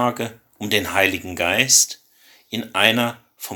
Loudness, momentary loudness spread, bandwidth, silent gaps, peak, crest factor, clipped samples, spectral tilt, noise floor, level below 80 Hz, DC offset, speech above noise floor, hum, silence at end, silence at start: -18 LUFS; 17 LU; 19.5 kHz; none; 0 dBFS; 22 dB; under 0.1%; -1.5 dB/octave; -53 dBFS; -58 dBFS; under 0.1%; 34 dB; none; 0 s; 0 s